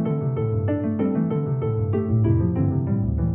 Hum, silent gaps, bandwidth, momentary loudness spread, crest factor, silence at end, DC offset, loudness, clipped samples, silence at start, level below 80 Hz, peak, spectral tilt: none; none; 3.3 kHz; 4 LU; 12 dB; 0 s; under 0.1%; -23 LUFS; under 0.1%; 0 s; -38 dBFS; -10 dBFS; -11.5 dB/octave